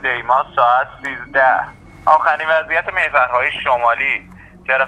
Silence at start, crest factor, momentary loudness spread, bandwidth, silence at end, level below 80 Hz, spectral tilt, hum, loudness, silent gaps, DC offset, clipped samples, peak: 0 s; 16 dB; 9 LU; 9.6 kHz; 0 s; -50 dBFS; -4 dB/octave; none; -16 LUFS; none; under 0.1%; under 0.1%; 0 dBFS